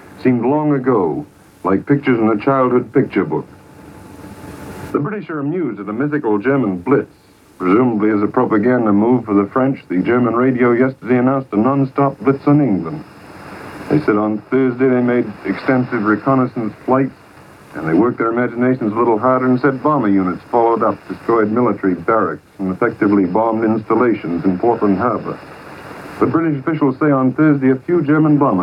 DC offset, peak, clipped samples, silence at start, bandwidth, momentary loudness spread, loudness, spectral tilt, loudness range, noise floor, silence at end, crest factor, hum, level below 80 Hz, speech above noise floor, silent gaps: under 0.1%; 0 dBFS; under 0.1%; 0.05 s; 9.8 kHz; 11 LU; -16 LUFS; -9.5 dB/octave; 4 LU; -41 dBFS; 0 s; 14 dB; none; -54 dBFS; 26 dB; none